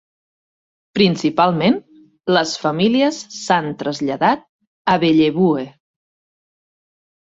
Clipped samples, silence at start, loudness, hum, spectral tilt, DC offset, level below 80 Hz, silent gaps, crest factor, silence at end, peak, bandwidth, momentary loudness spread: under 0.1%; 0.95 s; -17 LUFS; none; -5.5 dB/octave; under 0.1%; -58 dBFS; 4.49-4.59 s, 4.67-4.85 s; 18 dB; 1.7 s; -2 dBFS; 8 kHz; 10 LU